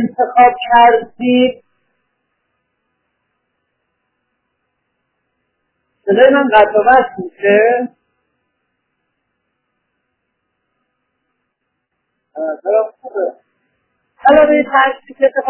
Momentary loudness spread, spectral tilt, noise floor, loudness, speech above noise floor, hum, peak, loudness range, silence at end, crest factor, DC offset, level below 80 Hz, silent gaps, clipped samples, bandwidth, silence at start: 14 LU; -8.5 dB/octave; -72 dBFS; -12 LUFS; 60 dB; none; 0 dBFS; 11 LU; 0 s; 16 dB; under 0.1%; -56 dBFS; none; under 0.1%; 4 kHz; 0 s